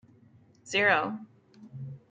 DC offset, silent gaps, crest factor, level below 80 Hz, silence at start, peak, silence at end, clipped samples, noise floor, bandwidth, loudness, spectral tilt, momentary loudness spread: under 0.1%; none; 22 dB; -76 dBFS; 0.65 s; -10 dBFS; 0.15 s; under 0.1%; -59 dBFS; 9.4 kHz; -26 LUFS; -4 dB/octave; 20 LU